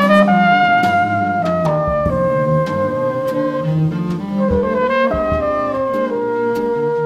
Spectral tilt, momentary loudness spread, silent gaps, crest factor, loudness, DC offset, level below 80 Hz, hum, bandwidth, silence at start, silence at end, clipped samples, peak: -7.5 dB/octave; 7 LU; none; 14 dB; -16 LUFS; under 0.1%; -36 dBFS; none; 14.5 kHz; 0 s; 0 s; under 0.1%; 0 dBFS